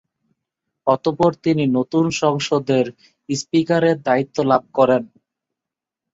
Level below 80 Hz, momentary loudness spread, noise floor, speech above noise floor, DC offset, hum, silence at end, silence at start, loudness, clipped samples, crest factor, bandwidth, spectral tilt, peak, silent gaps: -60 dBFS; 4 LU; -86 dBFS; 68 dB; under 0.1%; none; 1.05 s; 0.85 s; -19 LUFS; under 0.1%; 18 dB; 7.8 kHz; -6 dB/octave; 0 dBFS; none